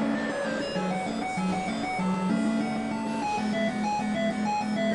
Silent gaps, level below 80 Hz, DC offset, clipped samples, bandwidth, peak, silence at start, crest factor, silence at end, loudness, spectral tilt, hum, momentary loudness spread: none; -58 dBFS; under 0.1%; under 0.1%; 11 kHz; -14 dBFS; 0 s; 12 dB; 0 s; -28 LUFS; -5.5 dB/octave; none; 3 LU